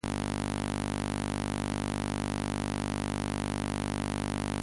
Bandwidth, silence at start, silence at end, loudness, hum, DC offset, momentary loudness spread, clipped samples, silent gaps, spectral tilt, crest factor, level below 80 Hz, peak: 11.5 kHz; 0.05 s; 0 s; -33 LUFS; 50 Hz at -60 dBFS; under 0.1%; 0 LU; under 0.1%; none; -5 dB/octave; 16 dB; -44 dBFS; -16 dBFS